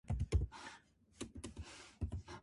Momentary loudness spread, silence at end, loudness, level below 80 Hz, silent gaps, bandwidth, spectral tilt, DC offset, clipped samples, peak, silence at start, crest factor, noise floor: 15 LU; 0 s; -45 LUFS; -46 dBFS; none; 11.5 kHz; -6 dB/octave; under 0.1%; under 0.1%; -24 dBFS; 0.05 s; 20 dB; -64 dBFS